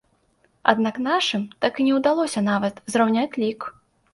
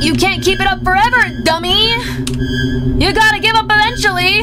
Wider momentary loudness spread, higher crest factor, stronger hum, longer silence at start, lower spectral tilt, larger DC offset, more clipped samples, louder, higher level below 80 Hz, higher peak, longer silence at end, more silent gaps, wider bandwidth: about the same, 6 LU vs 6 LU; first, 22 dB vs 10 dB; neither; first, 0.65 s vs 0 s; about the same, -4.5 dB/octave vs -4 dB/octave; neither; neither; second, -22 LUFS vs -12 LUFS; second, -66 dBFS vs -26 dBFS; about the same, 0 dBFS vs -2 dBFS; first, 0.4 s vs 0 s; neither; second, 11.5 kHz vs 16.5 kHz